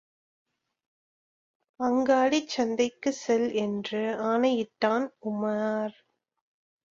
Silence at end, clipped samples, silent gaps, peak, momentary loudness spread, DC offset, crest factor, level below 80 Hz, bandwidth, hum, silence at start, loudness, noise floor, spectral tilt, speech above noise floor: 1 s; under 0.1%; none; -10 dBFS; 8 LU; under 0.1%; 18 dB; -72 dBFS; 7.6 kHz; none; 1.8 s; -27 LUFS; under -90 dBFS; -4.5 dB/octave; over 63 dB